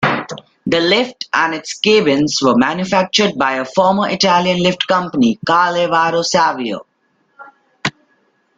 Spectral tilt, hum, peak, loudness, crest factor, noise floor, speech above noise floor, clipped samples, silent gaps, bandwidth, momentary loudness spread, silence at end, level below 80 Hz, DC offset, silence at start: -4 dB/octave; none; 0 dBFS; -15 LUFS; 16 dB; -61 dBFS; 47 dB; under 0.1%; none; 9.2 kHz; 11 LU; 0.7 s; -54 dBFS; under 0.1%; 0 s